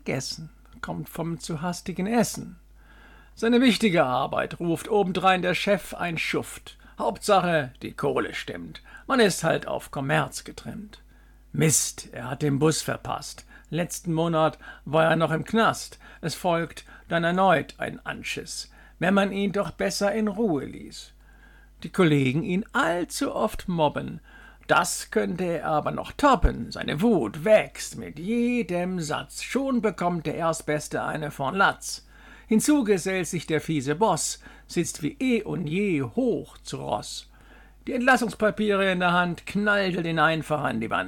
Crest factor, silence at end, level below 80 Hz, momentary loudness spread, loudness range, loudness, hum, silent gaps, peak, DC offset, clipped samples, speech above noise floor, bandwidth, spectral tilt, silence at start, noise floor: 18 dB; 0 s; -46 dBFS; 14 LU; 3 LU; -25 LUFS; none; none; -8 dBFS; under 0.1%; under 0.1%; 27 dB; 19 kHz; -4.5 dB/octave; 0.05 s; -52 dBFS